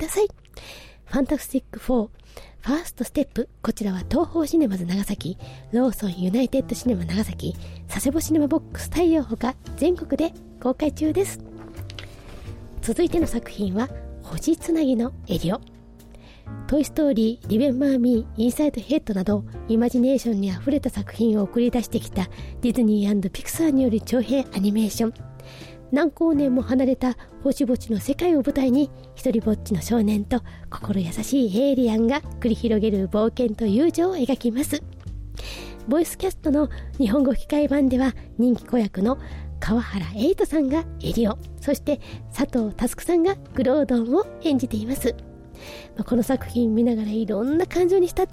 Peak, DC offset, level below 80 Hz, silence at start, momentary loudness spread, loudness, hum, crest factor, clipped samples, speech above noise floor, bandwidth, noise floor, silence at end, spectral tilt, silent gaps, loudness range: -12 dBFS; under 0.1%; -40 dBFS; 0 s; 13 LU; -23 LUFS; none; 12 dB; under 0.1%; 23 dB; 16 kHz; -45 dBFS; 0 s; -6 dB/octave; none; 4 LU